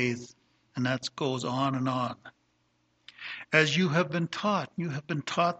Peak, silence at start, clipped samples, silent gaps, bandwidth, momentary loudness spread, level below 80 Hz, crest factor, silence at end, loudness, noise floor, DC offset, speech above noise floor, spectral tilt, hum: -6 dBFS; 0 s; under 0.1%; none; 8.6 kHz; 16 LU; -70 dBFS; 24 dB; 0.05 s; -29 LUFS; -72 dBFS; under 0.1%; 43 dB; -5 dB/octave; 60 Hz at -60 dBFS